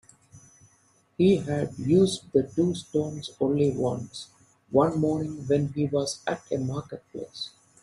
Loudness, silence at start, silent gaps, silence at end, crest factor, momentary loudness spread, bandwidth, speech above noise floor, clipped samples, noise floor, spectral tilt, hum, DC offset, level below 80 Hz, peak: -26 LUFS; 0.35 s; none; 0.35 s; 20 dB; 16 LU; 12 kHz; 38 dB; under 0.1%; -64 dBFS; -6.5 dB/octave; none; under 0.1%; -60 dBFS; -8 dBFS